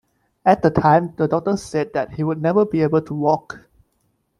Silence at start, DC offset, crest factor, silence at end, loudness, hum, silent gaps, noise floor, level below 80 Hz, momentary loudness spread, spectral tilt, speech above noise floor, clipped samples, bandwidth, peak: 0.45 s; under 0.1%; 18 dB; 0.8 s; -19 LUFS; none; none; -67 dBFS; -52 dBFS; 8 LU; -7.5 dB/octave; 49 dB; under 0.1%; 11.5 kHz; -2 dBFS